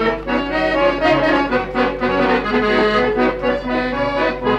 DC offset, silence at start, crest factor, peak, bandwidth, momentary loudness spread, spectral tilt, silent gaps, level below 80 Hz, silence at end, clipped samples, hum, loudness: under 0.1%; 0 s; 12 dB; -4 dBFS; 9.2 kHz; 5 LU; -6 dB/octave; none; -36 dBFS; 0 s; under 0.1%; none; -17 LUFS